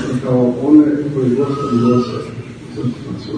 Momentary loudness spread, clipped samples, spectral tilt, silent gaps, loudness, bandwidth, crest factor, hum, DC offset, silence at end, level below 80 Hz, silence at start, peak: 16 LU; under 0.1%; -8.5 dB/octave; none; -15 LUFS; 9.8 kHz; 16 dB; none; under 0.1%; 0 s; -48 dBFS; 0 s; 0 dBFS